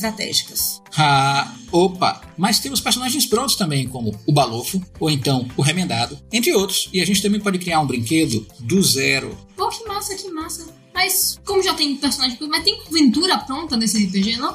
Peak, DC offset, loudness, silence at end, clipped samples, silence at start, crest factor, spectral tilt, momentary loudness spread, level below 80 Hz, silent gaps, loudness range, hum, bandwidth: -2 dBFS; under 0.1%; -19 LUFS; 0 s; under 0.1%; 0 s; 16 dB; -3.5 dB/octave; 9 LU; -48 dBFS; none; 2 LU; none; 16 kHz